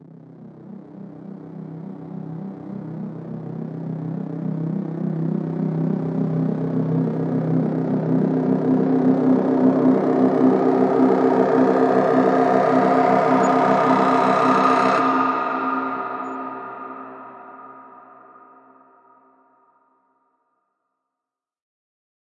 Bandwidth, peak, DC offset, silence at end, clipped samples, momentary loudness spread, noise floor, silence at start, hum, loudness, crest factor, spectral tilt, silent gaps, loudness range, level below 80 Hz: 8.2 kHz; -2 dBFS; under 0.1%; 4.3 s; under 0.1%; 19 LU; -86 dBFS; 0.1 s; none; -19 LUFS; 18 dB; -8.5 dB/octave; none; 16 LU; -72 dBFS